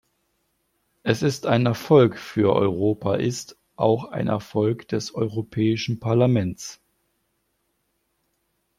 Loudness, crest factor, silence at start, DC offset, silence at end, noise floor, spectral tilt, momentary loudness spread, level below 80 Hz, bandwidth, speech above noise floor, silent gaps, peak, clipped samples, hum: -22 LUFS; 20 dB; 1.05 s; under 0.1%; 2.05 s; -73 dBFS; -6.5 dB/octave; 11 LU; -60 dBFS; 15.5 kHz; 51 dB; none; -4 dBFS; under 0.1%; none